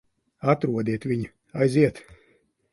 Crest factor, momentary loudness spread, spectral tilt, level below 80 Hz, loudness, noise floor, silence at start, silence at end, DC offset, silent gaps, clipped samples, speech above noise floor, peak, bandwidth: 20 dB; 9 LU; -8 dB/octave; -58 dBFS; -25 LUFS; -64 dBFS; 0.45 s; 0.75 s; under 0.1%; none; under 0.1%; 41 dB; -6 dBFS; 11.5 kHz